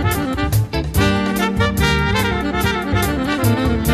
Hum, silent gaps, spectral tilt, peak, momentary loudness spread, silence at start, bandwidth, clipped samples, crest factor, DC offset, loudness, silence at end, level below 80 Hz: none; none; -5.5 dB/octave; -2 dBFS; 3 LU; 0 s; 14.5 kHz; under 0.1%; 16 dB; under 0.1%; -18 LUFS; 0 s; -26 dBFS